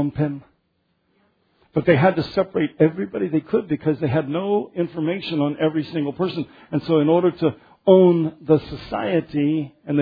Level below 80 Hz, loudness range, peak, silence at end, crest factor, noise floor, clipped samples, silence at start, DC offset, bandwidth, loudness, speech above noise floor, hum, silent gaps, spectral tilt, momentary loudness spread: -54 dBFS; 4 LU; -2 dBFS; 0 s; 18 dB; -69 dBFS; under 0.1%; 0 s; under 0.1%; 5 kHz; -21 LUFS; 49 dB; none; none; -10 dB/octave; 10 LU